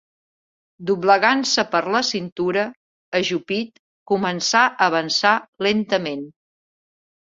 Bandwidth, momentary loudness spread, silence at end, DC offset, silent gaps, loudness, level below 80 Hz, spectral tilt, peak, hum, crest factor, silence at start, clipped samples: 7.8 kHz; 12 LU; 0.9 s; under 0.1%; 2.32-2.36 s, 2.76-3.12 s, 3.79-4.06 s, 5.48-5.53 s; -20 LUFS; -66 dBFS; -3 dB/octave; -2 dBFS; none; 20 dB; 0.8 s; under 0.1%